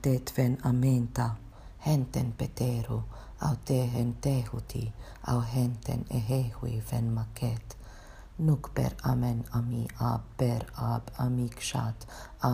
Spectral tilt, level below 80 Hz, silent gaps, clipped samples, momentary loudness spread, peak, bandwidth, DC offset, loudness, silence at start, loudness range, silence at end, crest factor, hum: -7 dB/octave; -46 dBFS; none; under 0.1%; 11 LU; -10 dBFS; 15.5 kHz; under 0.1%; -31 LUFS; 0 s; 2 LU; 0 s; 20 dB; none